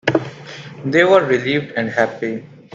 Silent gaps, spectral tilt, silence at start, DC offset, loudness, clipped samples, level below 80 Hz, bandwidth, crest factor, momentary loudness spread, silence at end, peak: none; -6 dB/octave; 0.05 s; under 0.1%; -17 LUFS; under 0.1%; -58 dBFS; 7.6 kHz; 18 dB; 19 LU; 0.3 s; 0 dBFS